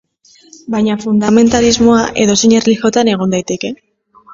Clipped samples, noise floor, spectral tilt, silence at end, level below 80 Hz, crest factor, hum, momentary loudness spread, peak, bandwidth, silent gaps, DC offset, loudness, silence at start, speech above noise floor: under 0.1%; -47 dBFS; -4.5 dB/octave; 0 s; -40 dBFS; 12 dB; none; 11 LU; 0 dBFS; 7.8 kHz; none; under 0.1%; -12 LUFS; 0.7 s; 36 dB